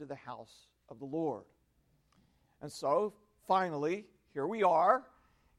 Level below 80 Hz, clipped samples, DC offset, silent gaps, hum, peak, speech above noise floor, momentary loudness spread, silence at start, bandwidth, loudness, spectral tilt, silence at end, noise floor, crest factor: -76 dBFS; under 0.1%; under 0.1%; none; none; -14 dBFS; 39 dB; 20 LU; 0 s; 14 kHz; -33 LUFS; -6 dB/octave; 0.55 s; -73 dBFS; 22 dB